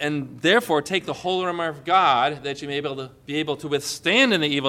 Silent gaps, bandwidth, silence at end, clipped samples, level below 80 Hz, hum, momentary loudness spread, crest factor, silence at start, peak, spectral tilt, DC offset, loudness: none; 16.5 kHz; 0 s; under 0.1%; -62 dBFS; none; 11 LU; 18 dB; 0 s; -6 dBFS; -4 dB/octave; under 0.1%; -22 LUFS